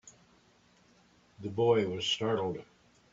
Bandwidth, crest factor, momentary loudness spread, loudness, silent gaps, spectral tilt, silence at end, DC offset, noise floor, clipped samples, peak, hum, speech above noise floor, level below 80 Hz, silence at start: 7.8 kHz; 20 dB; 15 LU; -31 LUFS; none; -5 dB/octave; 0.5 s; under 0.1%; -65 dBFS; under 0.1%; -14 dBFS; 60 Hz at -60 dBFS; 35 dB; -70 dBFS; 0.05 s